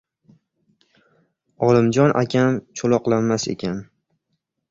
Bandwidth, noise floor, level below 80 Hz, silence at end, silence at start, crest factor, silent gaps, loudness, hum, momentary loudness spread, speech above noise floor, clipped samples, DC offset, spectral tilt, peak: 7.8 kHz; -75 dBFS; -56 dBFS; 0.9 s; 1.6 s; 20 dB; none; -19 LUFS; none; 10 LU; 57 dB; under 0.1%; under 0.1%; -6.5 dB/octave; -2 dBFS